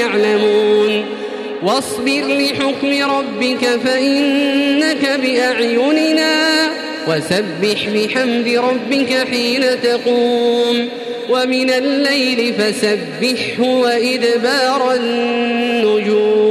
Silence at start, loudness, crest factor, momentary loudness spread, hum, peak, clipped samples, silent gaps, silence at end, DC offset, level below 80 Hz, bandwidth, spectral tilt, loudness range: 0 s; -15 LUFS; 12 dB; 4 LU; none; -4 dBFS; under 0.1%; none; 0 s; under 0.1%; -60 dBFS; 14 kHz; -3.5 dB/octave; 2 LU